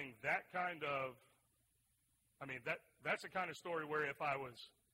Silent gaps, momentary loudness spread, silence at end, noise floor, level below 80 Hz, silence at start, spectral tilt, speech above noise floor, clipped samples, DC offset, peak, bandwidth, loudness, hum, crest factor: none; 9 LU; 0.25 s; -80 dBFS; -82 dBFS; 0 s; -4.5 dB/octave; 36 dB; under 0.1%; under 0.1%; -26 dBFS; 16 kHz; -43 LUFS; none; 20 dB